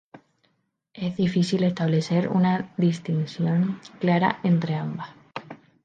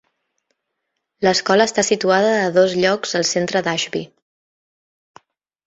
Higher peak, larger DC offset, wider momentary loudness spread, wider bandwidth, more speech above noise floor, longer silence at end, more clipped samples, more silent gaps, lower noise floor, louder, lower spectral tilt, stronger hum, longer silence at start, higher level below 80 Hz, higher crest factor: second, -6 dBFS vs -2 dBFS; neither; first, 13 LU vs 6 LU; about the same, 9 kHz vs 8.2 kHz; second, 49 dB vs 59 dB; second, 0.3 s vs 1.6 s; neither; neither; second, -72 dBFS vs -76 dBFS; second, -24 LUFS vs -17 LUFS; first, -7.5 dB/octave vs -3.5 dB/octave; neither; second, 0.15 s vs 1.2 s; about the same, -66 dBFS vs -62 dBFS; about the same, 18 dB vs 18 dB